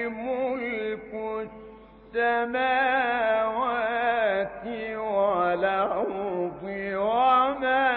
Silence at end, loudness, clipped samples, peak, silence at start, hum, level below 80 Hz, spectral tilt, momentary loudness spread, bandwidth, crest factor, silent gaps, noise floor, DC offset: 0 s; -26 LUFS; under 0.1%; -10 dBFS; 0 s; none; -58 dBFS; -8.5 dB/octave; 11 LU; 4.4 kHz; 16 dB; none; -47 dBFS; under 0.1%